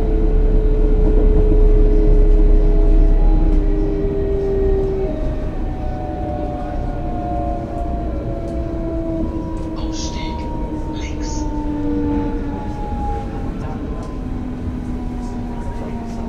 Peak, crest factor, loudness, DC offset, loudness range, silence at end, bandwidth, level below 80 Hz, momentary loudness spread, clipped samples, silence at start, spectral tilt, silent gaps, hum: -2 dBFS; 14 dB; -21 LUFS; under 0.1%; 7 LU; 0 s; 7 kHz; -18 dBFS; 10 LU; under 0.1%; 0 s; -8 dB/octave; none; none